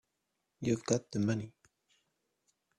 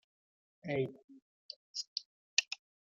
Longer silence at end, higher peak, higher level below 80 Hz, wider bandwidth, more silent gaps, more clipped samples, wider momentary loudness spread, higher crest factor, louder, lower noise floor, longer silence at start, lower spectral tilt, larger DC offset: first, 1.3 s vs 0.4 s; about the same, -14 dBFS vs -12 dBFS; first, -70 dBFS vs -82 dBFS; about the same, 11.5 kHz vs 11 kHz; second, none vs 1.04-1.08 s, 1.22-1.49 s, 1.56-1.74 s, 1.88-1.96 s, 2.05-2.37 s; neither; second, 8 LU vs 17 LU; second, 24 dB vs 30 dB; first, -35 LUFS vs -38 LUFS; second, -84 dBFS vs under -90 dBFS; about the same, 0.6 s vs 0.65 s; first, -5.5 dB/octave vs -2.5 dB/octave; neither